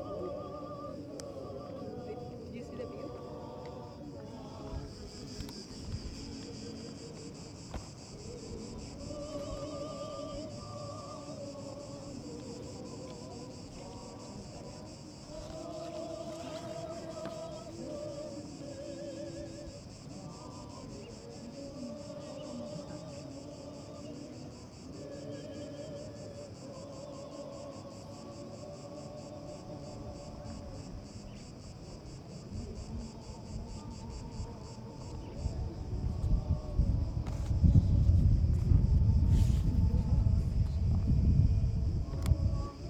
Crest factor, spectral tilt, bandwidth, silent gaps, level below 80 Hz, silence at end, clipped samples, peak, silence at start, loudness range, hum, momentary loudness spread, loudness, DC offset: 24 dB; -7.5 dB/octave; 10 kHz; none; -40 dBFS; 0 s; under 0.1%; -12 dBFS; 0 s; 16 LU; none; 18 LU; -37 LUFS; under 0.1%